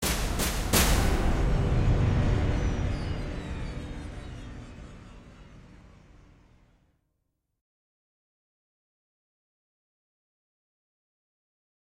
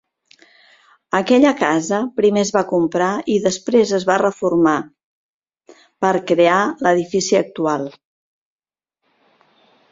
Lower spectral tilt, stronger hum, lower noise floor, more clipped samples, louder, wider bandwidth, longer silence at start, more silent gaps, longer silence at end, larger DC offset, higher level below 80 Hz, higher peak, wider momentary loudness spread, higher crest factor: about the same, -4.5 dB/octave vs -5 dB/octave; neither; about the same, -79 dBFS vs -77 dBFS; neither; second, -28 LUFS vs -17 LUFS; first, 16 kHz vs 7.8 kHz; second, 0 s vs 1.15 s; second, none vs 5.03-5.40 s; first, 6.15 s vs 2 s; neither; first, -34 dBFS vs -60 dBFS; second, -8 dBFS vs 0 dBFS; first, 20 LU vs 7 LU; about the same, 22 dB vs 18 dB